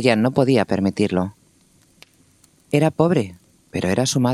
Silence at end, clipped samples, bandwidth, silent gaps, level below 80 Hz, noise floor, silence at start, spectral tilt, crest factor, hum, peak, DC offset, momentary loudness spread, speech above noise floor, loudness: 0 s; under 0.1%; 14 kHz; none; -56 dBFS; -57 dBFS; 0 s; -6 dB/octave; 20 dB; none; 0 dBFS; under 0.1%; 10 LU; 38 dB; -20 LUFS